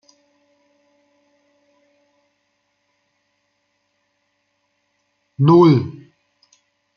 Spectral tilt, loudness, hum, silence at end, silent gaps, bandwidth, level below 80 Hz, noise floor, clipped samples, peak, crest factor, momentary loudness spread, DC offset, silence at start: -9.5 dB/octave; -14 LUFS; 50 Hz at -55 dBFS; 1.05 s; none; 6.6 kHz; -64 dBFS; -69 dBFS; under 0.1%; -2 dBFS; 22 dB; 31 LU; under 0.1%; 5.4 s